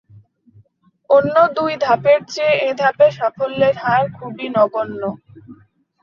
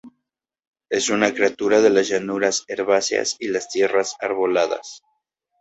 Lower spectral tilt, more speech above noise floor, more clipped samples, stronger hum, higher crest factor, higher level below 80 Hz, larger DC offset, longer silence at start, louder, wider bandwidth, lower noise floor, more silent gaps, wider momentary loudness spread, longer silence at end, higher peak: first, -5.5 dB/octave vs -2.5 dB/octave; second, 39 dB vs 61 dB; neither; neither; about the same, 16 dB vs 18 dB; about the same, -60 dBFS vs -64 dBFS; neither; first, 1.1 s vs 0.05 s; first, -16 LUFS vs -20 LUFS; second, 7.2 kHz vs 8.2 kHz; second, -55 dBFS vs -81 dBFS; second, none vs 0.67-0.73 s; first, 11 LU vs 8 LU; second, 0.5 s vs 0.65 s; about the same, -2 dBFS vs -2 dBFS